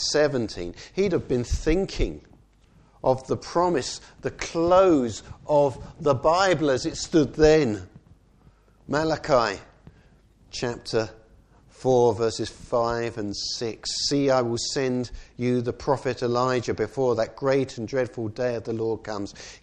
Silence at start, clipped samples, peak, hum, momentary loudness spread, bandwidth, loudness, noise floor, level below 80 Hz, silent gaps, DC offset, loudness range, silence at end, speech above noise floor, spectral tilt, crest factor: 0 s; under 0.1%; -4 dBFS; none; 12 LU; 10 kHz; -24 LUFS; -57 dBFS; -42 dBFS; none; under 0.1%; 5 LU; 0.05 s; 33 dB; -5 dB/octave; 20 dB